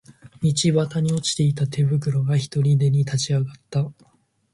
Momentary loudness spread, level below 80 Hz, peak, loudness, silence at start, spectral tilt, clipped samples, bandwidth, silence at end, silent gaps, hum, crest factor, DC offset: 7 LU; -56 dBFS; -8 dBFS; -22 LUFS; 0.1 s; -6 dB/octave; under 0.1%; 11.5 kHz; 0.6 s; none; none; 14 dB; under 0.1%